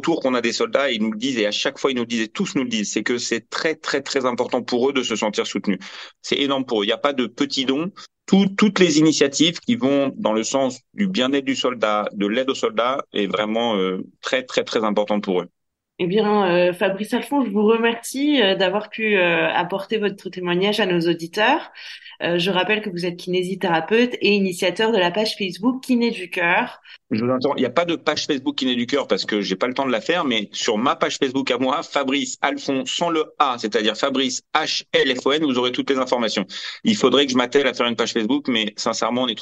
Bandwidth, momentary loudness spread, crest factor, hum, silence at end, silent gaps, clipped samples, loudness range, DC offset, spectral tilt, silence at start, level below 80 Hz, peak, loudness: 12.5 kHz; 6 LU; 20 dB; none; 0 s; none; under 0.1%; 3 LU; under 0.1%; -4 dB/octave; 0 s; -68 dBFS; 0 dBFS; -20 LUFS